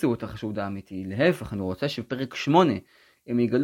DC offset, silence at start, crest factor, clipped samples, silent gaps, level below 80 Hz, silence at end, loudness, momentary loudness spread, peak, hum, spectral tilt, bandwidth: under 0.1%; 0 s; 20 dB; under 0.1%; none; -56 dBFS; 0 s; -26 LUFS; 12 LU; -6 dBFS; none; -7 dB/octave; 16.5 kHz